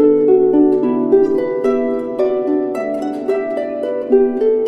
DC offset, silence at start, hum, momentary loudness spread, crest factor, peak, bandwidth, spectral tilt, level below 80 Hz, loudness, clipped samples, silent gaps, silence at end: under 0.1%; 0 s; none; 9 LU; 14 dB; -2 dBFS; 6 kHz; -8 dB/octave; -50 dBFS; -16 LUFS; under 0.1%; none; 0 s